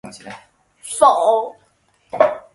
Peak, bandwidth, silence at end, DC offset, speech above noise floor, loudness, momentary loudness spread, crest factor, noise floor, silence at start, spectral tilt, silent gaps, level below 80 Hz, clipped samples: 0 dBFS; 11.5 kHz; 0.15 s; under 0.1%; 43 dB; -16 LUFS; 24 LU; 18 dB; -60 dBFS; 0.05 s; -2.5 dB/octave; none; -62 dBFS; under 0.1%